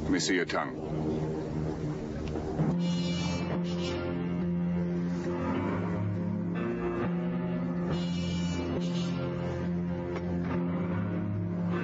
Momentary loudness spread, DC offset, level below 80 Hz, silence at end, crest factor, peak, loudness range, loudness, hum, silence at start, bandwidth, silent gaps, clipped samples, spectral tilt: 4 LU; under 0.1%; -50 dBFS; 0 s; 12 dB; -18 dBFS; 1 LU; -32 LUFS; none; 0 s; 8 kHz; none; under 0.1%; -6.5 dB/octave